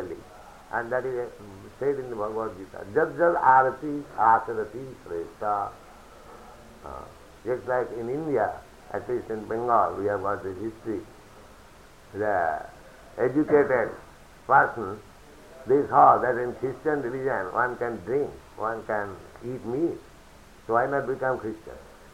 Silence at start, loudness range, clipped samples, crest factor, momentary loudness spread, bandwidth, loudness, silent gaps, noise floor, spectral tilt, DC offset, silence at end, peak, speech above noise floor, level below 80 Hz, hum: 0 s; 8 LU; under 0.1%; 22 dB; 20 LU; 16 kHz; -26 LUFS; none; -50 dBFS; -7 dB/octave; under 0.1%; 0.1 s; -4 dBFS; 25 dB; -56 dBFS; none